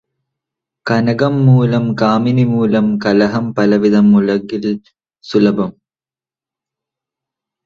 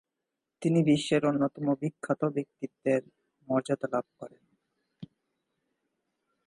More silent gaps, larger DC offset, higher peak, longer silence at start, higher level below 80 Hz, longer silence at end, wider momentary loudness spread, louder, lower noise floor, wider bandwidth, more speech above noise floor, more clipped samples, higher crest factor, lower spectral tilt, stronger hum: neither; neither; first, 0 dBFS vs -12 dBFS; first, 0.85 s vs 0.6 s; first, -52 dBFS vs -72 dBFS; first, 1.95 s vs 1.4 s; second, 9 LU vs 12 LU; first, -13 LUFS vs -29 LUFS; first, under -90 dBFS vs -86 dBFS; second, 7.2 kHz vs 11 kHz; first, over 78 dB vs 58 dB; neither; about the same, 14 dB vs 18 dB; first, -8.5 dB/octave vs -6.5 dB/octave; neither